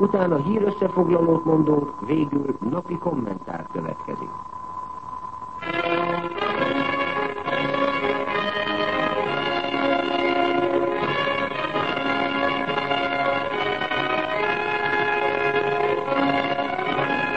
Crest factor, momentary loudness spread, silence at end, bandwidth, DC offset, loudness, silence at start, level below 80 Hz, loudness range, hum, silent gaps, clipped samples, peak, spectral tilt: 18 dB; 10 LU; 0 s; 8.4 kHz; 0.4%; -23 LUFS; 0 s; -56 dBFS; 5 LU; none; none; under 0.1%; -6 dBFS; -7 dB/octave